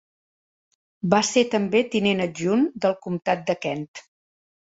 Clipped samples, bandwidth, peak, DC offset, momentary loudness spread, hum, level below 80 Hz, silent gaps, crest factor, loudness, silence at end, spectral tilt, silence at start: under 0.1%; 8 kHz; -4 dBFS; under 0.1%; 9 LU; none; -64 dBFS; 3.88-3.94 s; 20 dB; -23 LUFS; 0.7 s; -4.5 dB/octave; 1.05 s